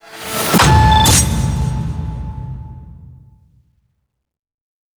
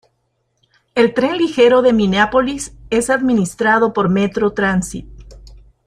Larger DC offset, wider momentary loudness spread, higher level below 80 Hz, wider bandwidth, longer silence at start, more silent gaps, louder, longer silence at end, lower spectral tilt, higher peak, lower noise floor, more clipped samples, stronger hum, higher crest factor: neither; first, 20 LU vs 10 LU; first, -24 dBFS vs -42 dBFS; first, over 20 kHz vs 15 kHz; second, 0.1 s vs 0.95 s; neither; about the same, -13 LUFS vs -15 LUFS; first, 1.8 s vs 0.3 s; about the same, -4 dB/octave vs -5 dB/octave; about the same, 0 dBFS vs 0 dBFS; about the same, -70 dBFS vs -67 dBFS; neither; neither; about the same, 16 dB vs 16 dB